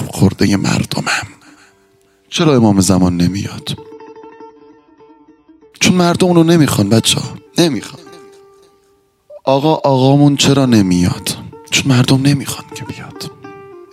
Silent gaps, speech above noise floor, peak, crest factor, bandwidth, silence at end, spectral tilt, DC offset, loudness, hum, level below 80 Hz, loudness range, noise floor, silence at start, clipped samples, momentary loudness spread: none; 43 dB; 0 dBFS; 14 dB; 16 kHz; 0.1 s; -5 dB/octave; under 0.1%; -13 LUFS; none; -48 dBFS; 4 LU; -55 dBFS; 0 s; under 0.1%; 18 LU